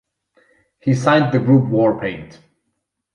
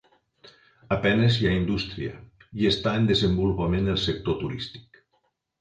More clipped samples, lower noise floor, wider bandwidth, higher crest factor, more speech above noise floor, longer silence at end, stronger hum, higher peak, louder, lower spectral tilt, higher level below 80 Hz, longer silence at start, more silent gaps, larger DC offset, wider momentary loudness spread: neither; about the same, -74 dBFS vs -72 dBFS; first, 10.5 kHz vs 9.2 kHz; about the same, 16 dB vs 16 dB; first, 58 dB vs 48 dB; about the same, 0.9 s vs 0.8 s; neither; first, -2 dBFS vs -8 dBFS; first, -16 LUFS vs -25 LUFS; about the same, -7.5 dB/octave vs -6.5 dB/octave; second, -54 dBFS vs -42 dBFS; about the same, 0.85 s vs 0.9 s; neither; neither; about the same, 12 LU vs 14 LU